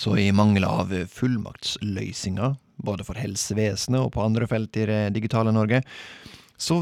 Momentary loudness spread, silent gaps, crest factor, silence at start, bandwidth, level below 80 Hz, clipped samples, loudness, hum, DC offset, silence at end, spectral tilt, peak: 11 LU; none; 18 dB; 0 s; 14.5 kHz; -52 dBFS; under 0.1%; -24 LUFS; none; under 0.1%; 0 s; -5.5 dB/octave; -6 dBFS